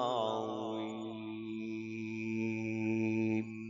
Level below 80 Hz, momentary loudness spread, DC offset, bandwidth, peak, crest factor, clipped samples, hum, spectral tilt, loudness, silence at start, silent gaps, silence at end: -76 dBFS; 9 LU; under 0.1%; 7.2 kHz; -20 dBFS; 16 dB; under 0.1%; none; -5.5 dB/octave; -37 LUFS; 0 s; none; 0 s